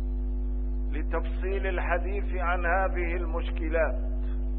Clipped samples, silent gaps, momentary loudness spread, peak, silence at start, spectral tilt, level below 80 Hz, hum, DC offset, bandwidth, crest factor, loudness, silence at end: under 0.1%; none; 6 LU; -12 dBFS; 0 s; -11 dB/octave; -28 dBFS; none; 0.3%; 3.8 kHz; 16 dB; -30 LUFS; 0 s